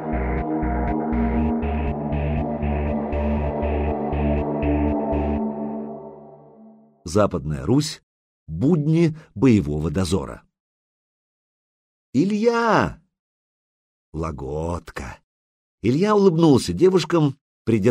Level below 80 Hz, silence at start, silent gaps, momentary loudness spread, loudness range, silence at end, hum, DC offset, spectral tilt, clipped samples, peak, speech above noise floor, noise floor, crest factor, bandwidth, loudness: -32 dBFS; 0 s; 8.03-8.46 s, 10.60-12.13 s, 13.19-14.12 s, 15.23-15.78 s, 17.41-17.65 s; 14 LU; 5 LU; 0 s; none; under 0.1%; -7 dB/octave; under 0.1%; -4 dBFS; 30 dB; -49 dBFS; 18 dB; 14.5 kHz; -22 LUFS